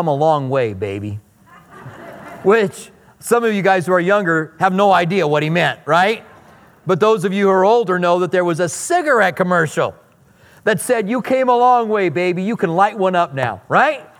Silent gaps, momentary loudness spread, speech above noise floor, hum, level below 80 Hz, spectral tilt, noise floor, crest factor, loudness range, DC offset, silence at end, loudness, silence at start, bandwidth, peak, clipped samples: none; 11 LU; 34 dB; none; -62 dBFS; -5.5 dB/octave; -50 dBFS; 16 dB; 3 LU; under 0.1%; 0.15 s; -16 LUFS; 0 s; 17 kHz; 0 dBFS; under 0.1%